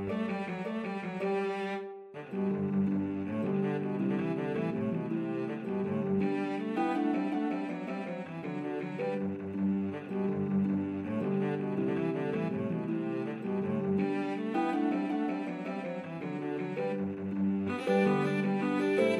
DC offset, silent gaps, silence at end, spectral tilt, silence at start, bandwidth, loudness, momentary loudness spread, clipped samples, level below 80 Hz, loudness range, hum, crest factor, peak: under 0.1%; none; 0 s; -8.5 dB/octave; 0 s; 11 kHz; -33 LUFS; 7 LU; under 0.1%; -76 dBFS; 2 LU; none; 16 dB; -16 dBFS